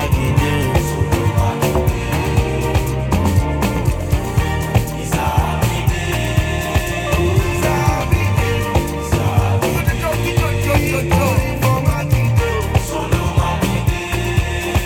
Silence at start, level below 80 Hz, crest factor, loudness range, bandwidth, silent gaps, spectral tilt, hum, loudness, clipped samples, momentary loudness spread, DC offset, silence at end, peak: 0 s; -24 dBFS; 16 dB; 1 LU; 18 kHz; none; -6 dB/octave; none; -17 LUFS; under 0.1%; 3 LU; under 0.1%; 0 s; 0 dBFS